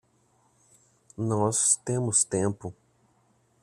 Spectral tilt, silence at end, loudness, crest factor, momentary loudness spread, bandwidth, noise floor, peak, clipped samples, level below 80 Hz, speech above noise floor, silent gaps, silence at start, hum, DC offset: -4.5 dB/octave; 0.9 s; -25 LUFS; 22 dB; 18 LU; 14.5 kHz; -66 dBFS; -8 dBFS; under 0.1%; -66 dBFS; 40 dB; none; 1.2 s; none; under 0.1%